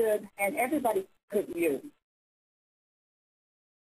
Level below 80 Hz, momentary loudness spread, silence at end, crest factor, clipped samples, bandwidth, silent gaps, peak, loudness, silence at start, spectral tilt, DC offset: -72 dBFS; 6 LU; 2 s; 18 dB; under 0.1%; 15.5 kHz; 1.23-1.28 s; -16 dBFS; -31 LUFS; 0 s; -4.5 dB/octave; under 0.1%